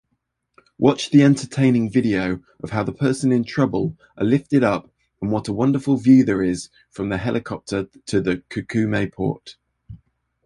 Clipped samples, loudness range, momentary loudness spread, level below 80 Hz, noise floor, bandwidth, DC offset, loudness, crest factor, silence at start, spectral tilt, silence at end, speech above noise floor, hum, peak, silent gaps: under 0.1%; 5 LU; 12 LU; -50 dBFS; -73 dBFS; 11 kHz; under 0.1%; -20 LUFS; 18 dB; 0.8 s; -7 dB/octave; 0.5 s; 54 dB; none; -2 dBFS; none